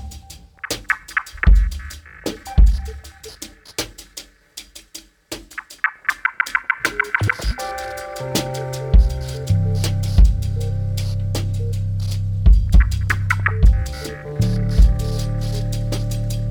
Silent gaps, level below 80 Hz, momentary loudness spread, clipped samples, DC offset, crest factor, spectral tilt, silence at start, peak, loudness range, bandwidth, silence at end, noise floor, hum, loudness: none; -20 dBFS; 19 LU; under 0.1%; under 0.1%; 16 dB; -5 dB/octave; 0 s; -2 dBFS; 6 LU; 19 kHz; 0 s; -42 dBFS; none; -20 LUFS